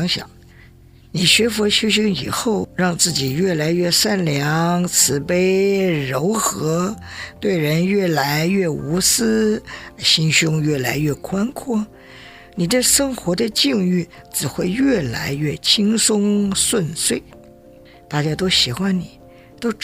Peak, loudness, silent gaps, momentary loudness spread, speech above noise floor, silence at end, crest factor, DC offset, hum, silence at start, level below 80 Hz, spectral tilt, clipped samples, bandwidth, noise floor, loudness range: 0 dBFS; -17 LUFS; none; 9 LU; 27 dB; 0 s; 18 dB; under 0.1%; none; 0 s; -48 dBFS; -3.5 dB/octave; under 0.1%; 16.5 kHz; -46 dBFS; 2 LU